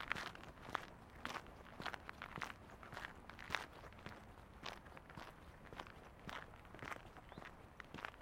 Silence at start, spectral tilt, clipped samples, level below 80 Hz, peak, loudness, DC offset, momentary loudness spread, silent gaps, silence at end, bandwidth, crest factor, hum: 0 s; -4 dB/octave; under 0.1%; -66 dBFS; -18 dBFS; -52 LUFS; under 0.1%; 11 LU; none; 0 s; 16.5 kHz; 34 dB; none